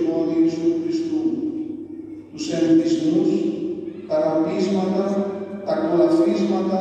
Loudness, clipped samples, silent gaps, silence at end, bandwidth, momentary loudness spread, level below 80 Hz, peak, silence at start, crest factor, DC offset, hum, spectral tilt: -21 LUFS; under 0.1%; none; 0 s; 8.4 kHz; 13 LU; -64 dBFS; -6 dBFS; 0 s; 14 dB; under 0.1%; none; -7 dB/octave